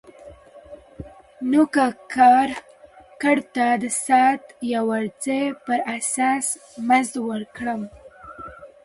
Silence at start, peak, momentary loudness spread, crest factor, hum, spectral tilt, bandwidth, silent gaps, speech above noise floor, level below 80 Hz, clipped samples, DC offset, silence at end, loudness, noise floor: 0.25 s; -4 dBFS; 22 LU; 18 dB; none; -3.5 dB/octave; 11.5 kHz; none; 28 dB; -58 dBFS; under 0.1%; under 0.1%; 0.2 s; -21 LUFS; -48 dBFS